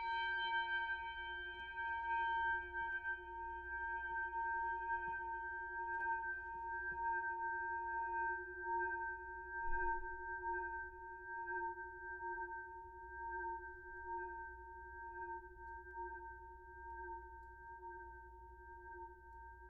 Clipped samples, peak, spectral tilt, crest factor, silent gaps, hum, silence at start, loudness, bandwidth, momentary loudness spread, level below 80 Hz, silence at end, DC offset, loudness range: under 0.1%; -28 dBFS; -0.5 dB/octave; 16 dB; none; none; 0 s; -44 LUFS; 5 kHz; 14 LU; -60 dBFS; 0 s; under 0.1%; 10 LU